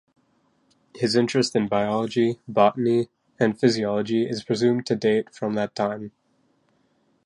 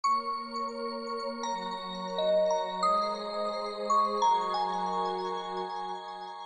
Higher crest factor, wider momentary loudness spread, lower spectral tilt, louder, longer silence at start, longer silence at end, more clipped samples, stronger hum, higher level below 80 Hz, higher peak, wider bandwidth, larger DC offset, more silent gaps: about the same, 18 dB vs 14 dB; about the same, 7 LU vs 9 LU; first, -5.5 dB/octave vs -4 dB/octave; first, -23 LUFS vs -31 LUFS; first, 0.95 s vs 0.05 s; first, 1.15 s vs 0 s; neither; neither; about the same, -66 dBFS vs -70 dBFS; first, -6 dBFS vs -16 dBFS; first, 11.5 kHz vs 9.4 kHz; neither; neither